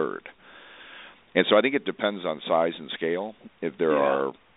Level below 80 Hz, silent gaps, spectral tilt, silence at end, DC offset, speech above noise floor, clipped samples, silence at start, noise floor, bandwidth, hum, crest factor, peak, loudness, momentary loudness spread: -72 dBFS; none; -2.5 dB/octave; 0.25 s; under 0.1%; 24 dB; under 0.1%; 0 s; -49 dBFS; 4.1 kHz; none; 22 dB; -4 dBFS; -25 LUFS; 23 LU